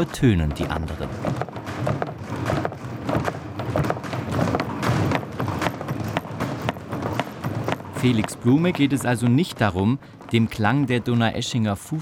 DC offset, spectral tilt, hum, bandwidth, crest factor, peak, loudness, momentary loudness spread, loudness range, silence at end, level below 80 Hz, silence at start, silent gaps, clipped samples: under 0.1%; -6.5 dB/octave; none; 16.5 kHz; 20 dB; -4 dBFS; -24 LUFS; 9 LU; 6 LU; 0 s; -44 dBFS; 0 s; none; under 0.1%